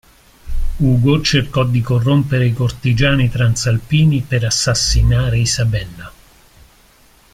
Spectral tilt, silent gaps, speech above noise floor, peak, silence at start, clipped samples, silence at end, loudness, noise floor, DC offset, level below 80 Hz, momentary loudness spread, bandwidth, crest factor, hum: -5 dB/octave; none; 35 dB; -2 dBFS; 0.45 s; under 0.1%; 1.25 s; -15 LUFS; -49 dBFS; under 0.1%; -26 dBFS; 7 LU; 15 kHz; 14 dB; none